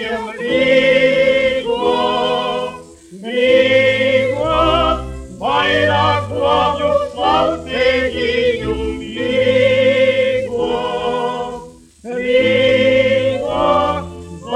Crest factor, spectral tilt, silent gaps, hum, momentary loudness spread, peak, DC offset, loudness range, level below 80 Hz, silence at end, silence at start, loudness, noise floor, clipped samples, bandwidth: 14 dB; -5 dB/octave; none; none; 11 LU; 0 dBFS; under 0.1%; 2 LU; -38 dBFS; 0 s; 0 s; -15 LUFS; -36 dBFS; under 0.1%; 10.5 kHz